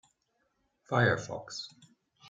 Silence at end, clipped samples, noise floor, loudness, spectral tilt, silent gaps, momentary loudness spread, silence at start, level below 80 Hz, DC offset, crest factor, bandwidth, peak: 0 s; under 0.1%; -77 dBFS; -31 LUFS; -5.5 dB/octave; none; 15 LU; 0.9 s; -70 dBFS; under 0.1%; 24 dB; 8.8 kHz; -12 dBFS